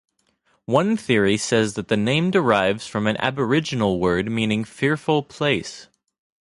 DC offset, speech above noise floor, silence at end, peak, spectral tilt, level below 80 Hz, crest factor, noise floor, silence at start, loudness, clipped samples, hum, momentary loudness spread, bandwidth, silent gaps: under 0.1%; 45 dB; 0.6 s; -2 dBFS; -5.5 dB/octave; -52 dBFS; 20 dB; -65 dBFS; 0.7 s; -21 LUFS; under 0.1%; none; 5 LU; 11.5 kHz; none